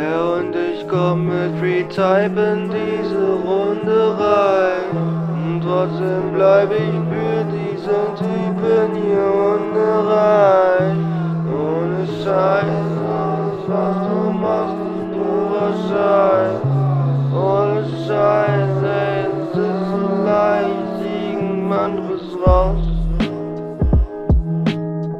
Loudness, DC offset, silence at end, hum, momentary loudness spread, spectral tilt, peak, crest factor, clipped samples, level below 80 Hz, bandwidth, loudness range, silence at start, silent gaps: -18 LUFS; under 0.1%; 0 s; none; 7 LU; -9 dB/octave; 0 dBFS; 16 dB; under 0.1%; -30 dBFS; 8.2 kHz; 3 LU; 0 s; none